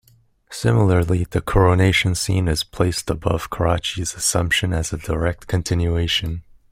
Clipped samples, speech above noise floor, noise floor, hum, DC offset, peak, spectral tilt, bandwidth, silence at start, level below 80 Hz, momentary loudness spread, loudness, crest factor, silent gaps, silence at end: under 0.1%; 35 dB; -54 dBFS; none; under 0.1%; -2 dBFS; -4.5 dB/octave; 16 kHz; 0.5 s; -34 dBFS; 8 LU; -20 LUFS; 18 dB; none; 0.3 s